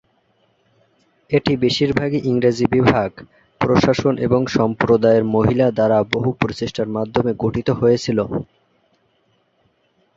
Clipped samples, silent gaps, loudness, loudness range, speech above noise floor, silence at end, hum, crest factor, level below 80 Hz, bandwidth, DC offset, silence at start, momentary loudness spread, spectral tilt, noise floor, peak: under 0.1%; none; -18 LUFS; 5 LU; 46 dB; 1.75 s; none; 18 dB; -46 dBFS; 7.8 kHz; under 0.1%; 1.3 s; 7 LU; -7 dB/octave; -63 dBFS; 0 dBFS